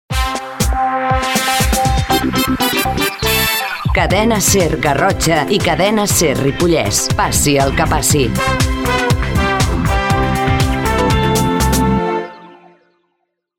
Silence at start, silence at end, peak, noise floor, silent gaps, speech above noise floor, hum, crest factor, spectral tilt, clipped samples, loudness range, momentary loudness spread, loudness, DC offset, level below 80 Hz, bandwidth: 0.1 s; 1.05 s; 0 dBFS; -69 dBFS; none; 56 dB; none; 14 dB; -4 dB/octave; under 0.1%; 2 LU; 4 LU; -14 LUFS; under 0.1%; -24 dBFS; 17 kHz